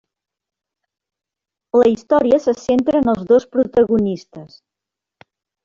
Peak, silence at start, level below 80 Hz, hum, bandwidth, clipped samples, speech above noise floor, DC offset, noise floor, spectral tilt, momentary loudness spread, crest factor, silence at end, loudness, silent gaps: -4 dBFS; 1.75 s; -52 dBFS; none; 7.4 kHz; under 0.1%; 69 dB; under 0.1%; -85 dBFS; -7 dB/octave; 4 LU; 16 dB; 1.2 s; -16 LUFS; none